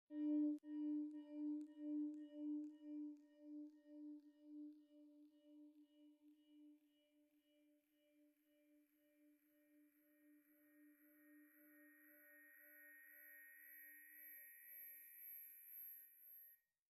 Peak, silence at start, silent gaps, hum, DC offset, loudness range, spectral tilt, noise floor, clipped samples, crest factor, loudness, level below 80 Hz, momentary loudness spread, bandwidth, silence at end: -36 dBFS; 0.1 s; none; none; under 0.1%; 16 LU; -4 dB/octave; -80 dBFS; under 0.1%; 18 dB; -52 LUFS; under -90 dBFS; 21 LU; 13 kHz; 0.35 s